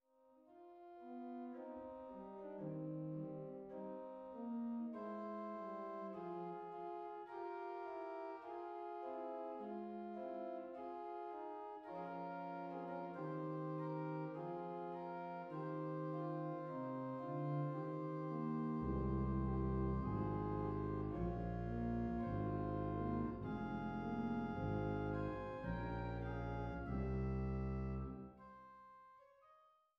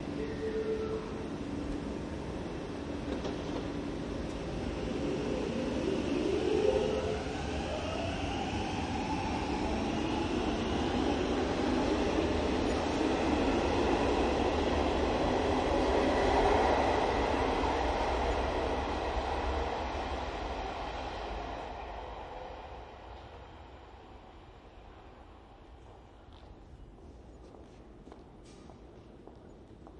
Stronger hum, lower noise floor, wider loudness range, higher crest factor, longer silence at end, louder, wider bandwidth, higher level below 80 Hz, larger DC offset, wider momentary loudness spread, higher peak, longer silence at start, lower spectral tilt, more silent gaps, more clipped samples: neither; first, -71 dBFS vs -53 dBFS; second, 7 LU vs 24 LU; about the same, 16 dB vs 18 dB; first, 0.35 s vs 0 s; second, -45 LUFS vs -33 LUFS; second, 6.4 kHz vs 11 kHz; second, -56 dBFS vs -44 dBFS; neither; second, 9 LU vs 24 LU; second, -30 dBFS vs -14 dBFS; first, 0.25 s vs 0 s; first, -8.5 dB/octave vs -6 dB/octave; neither; neither